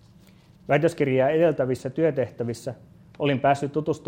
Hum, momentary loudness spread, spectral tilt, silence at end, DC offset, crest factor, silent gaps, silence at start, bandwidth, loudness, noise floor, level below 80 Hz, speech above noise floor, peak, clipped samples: none; 13 LU; -7 dB/octave; 0.1 s; under 0.1%; 18 dB; none; 0.7 s; 16 kHz; -24 LUFS; -53 dBFS; -60 dBFS; 30 dB; -6 dBFS; under 0.1%